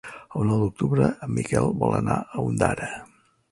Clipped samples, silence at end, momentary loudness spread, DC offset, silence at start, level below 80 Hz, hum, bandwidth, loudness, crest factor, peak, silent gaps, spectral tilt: under 0.1%; 0.45 s; 9 LU; under 0.1%; 0.05 s; -46 dBFS; none; 11.5 kHz; -25 LUFS; 20 dB; -4 dBFS; none; -7.5 dB/octave